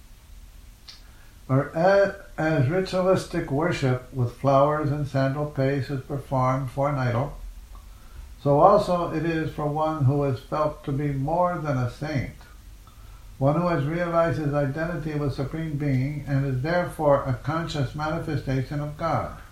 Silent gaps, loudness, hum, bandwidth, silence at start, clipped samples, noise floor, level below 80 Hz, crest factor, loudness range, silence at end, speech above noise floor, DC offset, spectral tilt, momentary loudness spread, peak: none; -25 LUFS; none; 14 kHz; 0.05 s; under 0.1%; -47 dBFS; -44 dBFS; 22 dB; 3 LU; 0.05 s; 23 dB; under 0.1%; -7.5 dB/octave; 8 LU; -2 dBFS